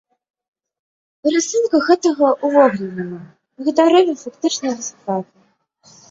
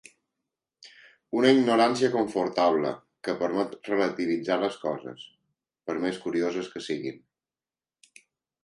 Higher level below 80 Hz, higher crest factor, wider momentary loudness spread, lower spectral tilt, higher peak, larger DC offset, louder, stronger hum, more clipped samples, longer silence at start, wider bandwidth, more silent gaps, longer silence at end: first, -66 dBFS vs -72 dBFS; second, 16 dB vs 22 dB; about the same, 13 LU vs 14 LU; about the same, -4 dB/octave vs -5 dB/octave; first, -2 dBFS vs -6 dBFS; neither; first, -17 LUFS vs -26 LUFS; neither; neither; first, 1.25 s vs 0.85 s; second, 7.8 kHz vs 11.5 kHz; neither; second, 0.9 s vs 1.45 s